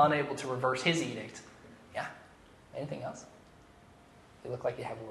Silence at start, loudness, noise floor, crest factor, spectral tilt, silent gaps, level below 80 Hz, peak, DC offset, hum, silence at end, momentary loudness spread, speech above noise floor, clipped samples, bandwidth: 0 s; -35 LUFS; -58 dBFS; 22 dB; -4.5 dB/octave; none; -68 dBFS; -12 dBFS; under 0.1%; none; 0 s; 21 LU; 25 dB; under 0.1%; 12.5 kHz